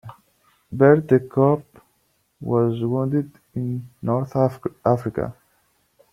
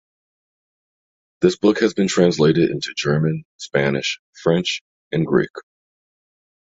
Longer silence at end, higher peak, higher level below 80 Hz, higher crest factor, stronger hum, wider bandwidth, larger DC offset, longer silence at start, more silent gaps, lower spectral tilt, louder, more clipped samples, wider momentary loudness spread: second, 0.8 s vs 1.1 s; about the same, -2 dBFS vs -2 dBFS; about the same, -56 dBFS vs -56 dBFS; about the same, 20 dB vs 18 dB; neither; first, 13 kHz vs 8 kHz; neither; second, 0.05 s vs 1.4 s; second, none vs 3.45-3.59 s, 4.19-4.33 s, 4.81-5.11 s, 5.50-5.54 s; first, -10 dB/octave vs -5.5 dB/octave; about the same, -21 LUFS vs -19 LUFS; neither; first, 14 LU vs 9 LU